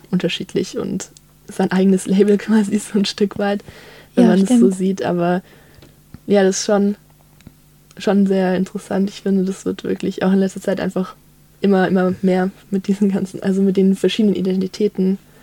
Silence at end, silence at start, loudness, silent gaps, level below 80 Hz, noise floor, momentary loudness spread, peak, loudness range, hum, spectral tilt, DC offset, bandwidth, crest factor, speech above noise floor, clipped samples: 0.25 s; 0.1 s; -18 LUFS; none; -56 dBFS; -46 dBFS; 9 LU; 0 dBFS; 4 LU; none; -6.5 dB/octave; under 0.1%; 13 kHz; 18 dB; 29 dB; under 0.1%